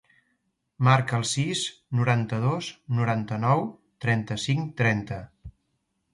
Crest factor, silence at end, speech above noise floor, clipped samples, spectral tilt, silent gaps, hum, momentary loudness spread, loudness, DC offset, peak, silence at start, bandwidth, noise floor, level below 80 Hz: 18 dB; 0.65 s; 50 dB; under 0.1%; -5.5 dB/octave; none; none; 10 LU; -26 LUFS; under 0.1%; -8 dBFS; 0.8 s; 11.5 kHz; -75 dBFS; -56 dBFS